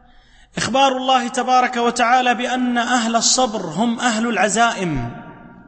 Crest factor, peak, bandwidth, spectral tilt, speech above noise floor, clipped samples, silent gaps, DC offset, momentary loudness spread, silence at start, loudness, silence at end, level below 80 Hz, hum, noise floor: 16 dB; -4 dBFS; 8.8 kHz; -2.5 dB/octave; 31 dB; under 0.1%; none; under 0.1%; 9 LU; 0.55 s; -17 LUFS; 0.05 s; -44 dBFS; none; -48 dBFS